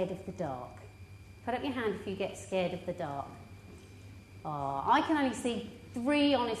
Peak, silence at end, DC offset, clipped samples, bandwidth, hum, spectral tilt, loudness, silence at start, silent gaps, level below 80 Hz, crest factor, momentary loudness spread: -16 dBFS; 0 s; under 0.1%; under 0.1%; 13 kHz; none; -5.5 dB/octave; -33 LUFS; 0 s; none; -60 dBFS; 18 dB; 24 LU